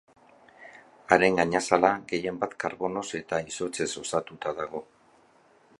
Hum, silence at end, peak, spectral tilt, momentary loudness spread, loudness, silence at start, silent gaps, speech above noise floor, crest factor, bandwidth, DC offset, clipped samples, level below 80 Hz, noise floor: none; 0.95 s; -4 dBFS; -4 dB/octave; 12 LU; -27 LUFS; 0.6 s; none; 33 dB; 24 dB; 11.5 kHz; under 0.1%; under 0.1%; -62 dBFS; -60 dBFS